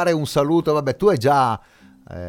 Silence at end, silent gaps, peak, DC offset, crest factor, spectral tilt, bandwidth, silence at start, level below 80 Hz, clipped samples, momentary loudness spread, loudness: 0 s; none; -4 dBFS; under 0.1%; 16 dB; -6.5 dB/octave; 17.5 kHz; 0 s; -50 dBFS; under 0.1%; 9 LU; -19 LUFS